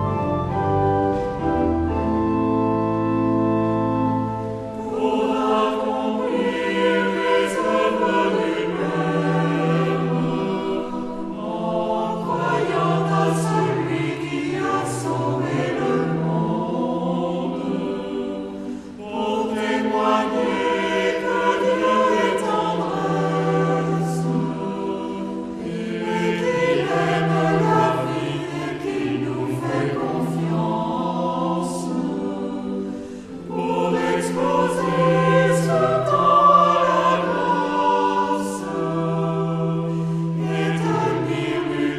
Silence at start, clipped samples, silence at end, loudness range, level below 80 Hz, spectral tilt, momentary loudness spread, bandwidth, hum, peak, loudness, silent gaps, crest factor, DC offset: 0 s; under 0.1%; 0 s; 6 LU; -48 dBFS; -6.5 dB/octave; 8 LU; 12.5 kHz; none; -4 dBFS; -21 LUFS; none; 18 dB; under 0.1%